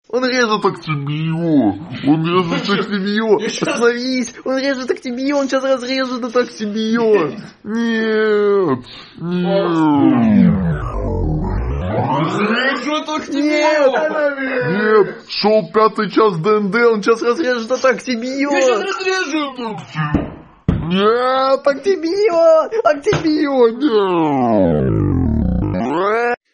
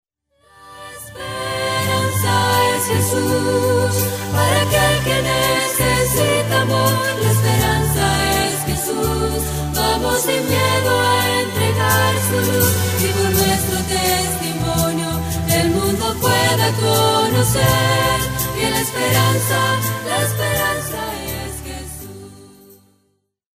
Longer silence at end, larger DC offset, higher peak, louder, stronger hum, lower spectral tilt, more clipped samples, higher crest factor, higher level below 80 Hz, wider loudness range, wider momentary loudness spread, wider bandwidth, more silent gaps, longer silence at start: second, 0.2 s vs 1.1 s; neither; about the same, 0 dBFS vs -2 dBFS; about the same, -16 LUFS vs -17 LUFS; neither; first, -6 dB/octave vs -4 dB/octave; neither; about the same, 16 dB vs 16 dB; about the same, -34 dBFS vs -34 dBFS; about the same, 3 LU vs 3 LU; about the same, 8 LU vs 8 LU; second, 10 kHz vs 16 kHz; neither; second, 0.15 s vs 0.6 s